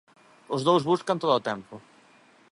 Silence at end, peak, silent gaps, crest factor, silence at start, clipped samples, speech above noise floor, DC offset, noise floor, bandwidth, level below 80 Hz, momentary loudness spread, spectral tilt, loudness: 0.7 s; -8 dBFS; none; 20 dB; 0.5 s; under 0.1%; 33 dB; under 0.1%; -58 dBFS; 11.5 kHz; -72 dBFS; 13 LU; -6 dB/octave; -25 LUFS